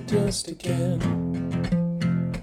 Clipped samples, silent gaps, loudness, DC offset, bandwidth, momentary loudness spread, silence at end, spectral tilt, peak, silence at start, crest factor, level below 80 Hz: under 0.1%; none; -26 LUFS; under 0.1%; 13 kHz; 3 LU; 0 s; -6.5 dB/octave; -10 dBFS; 0 s; 16 dB; -44 dBFS